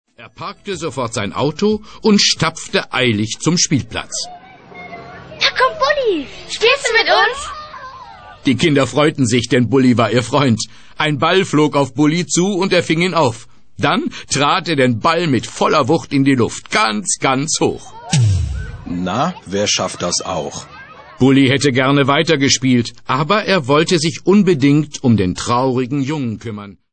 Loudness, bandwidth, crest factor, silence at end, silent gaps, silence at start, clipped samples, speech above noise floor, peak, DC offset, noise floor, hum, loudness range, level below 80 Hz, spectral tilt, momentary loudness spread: -15 LUFS; 9.2 kHz; 14 dB; 0.2 s; none; 0.2 s; under 0.1%; 21 dB; -2 dBFS; 0.9%; -36 dBFS; none; 4 LU; -42 dBFS; -4.5 dB/octave; 13 LU